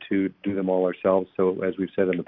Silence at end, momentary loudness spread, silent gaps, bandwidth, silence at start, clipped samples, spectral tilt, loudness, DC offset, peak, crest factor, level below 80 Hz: 0.05 s; 5 LU; none; 3.9 kHz; 0 s; under 0.1%; -11.5 dB/octave; -25 LUFS; under 0.1%; -8 dBFS; 16 dB; -66 dBFS